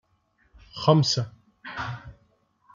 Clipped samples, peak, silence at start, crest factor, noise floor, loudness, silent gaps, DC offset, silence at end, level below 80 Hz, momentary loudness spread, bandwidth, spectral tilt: under 0.1%; -6 dBFS; 0.75 s; 22 dB; -67 dBFS; -24 LUFS; none; under 0.1%; 0.65 s; -58 dBFS; 22 LU; 7.4 kHz; -5.5 dB/octave